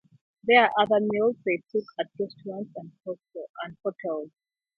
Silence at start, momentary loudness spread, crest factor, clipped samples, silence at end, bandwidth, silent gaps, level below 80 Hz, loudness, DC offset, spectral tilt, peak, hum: 0.45 s; 19 LU; 22 dB; under 0.1%; 0.5 s; 5.8 kHz; 3.49-3.54 s; -74 dBFS; -25 LUFS; under 0.1%; -7.5 dB/octave; -6 dBFS; none